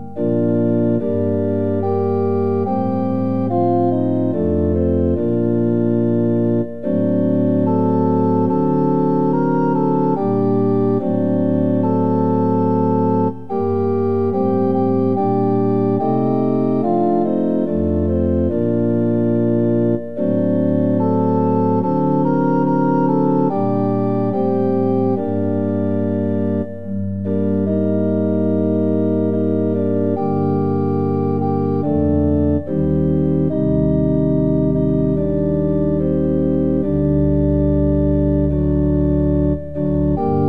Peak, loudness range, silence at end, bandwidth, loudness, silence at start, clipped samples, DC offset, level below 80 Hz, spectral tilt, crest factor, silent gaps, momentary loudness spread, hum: -4 dBFS; 2 LU; 0 s; 5 kHz; -17 LUFS; 0 s; under 0.1%; 2%; -34 dBFS; -12.5 dB/octave; 12 dB; none; 3 LU; none